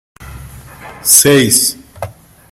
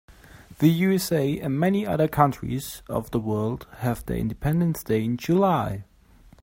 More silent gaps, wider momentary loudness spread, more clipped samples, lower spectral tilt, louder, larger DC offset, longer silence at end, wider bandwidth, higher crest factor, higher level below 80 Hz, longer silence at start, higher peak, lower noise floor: neither; first, 23 LU vs 10 LU; first, 0.3% vs under 0.1%; second, -2.5 dB/octave vs -7 dB/octave; first, -8 LUFS vs -24 LUFS; neither; second, 0.4 s vs 0.6 s; first, over 20 kHz vs 16.5 kHz; second, 14 dB vs 20 dB; about the same, -42 dBFS vs -46 dBFS; second, 0.2 s vs 0.35 s; first, 0 dBFS vs -4 dBFS; second, -33 dBFS vs -53 dBFS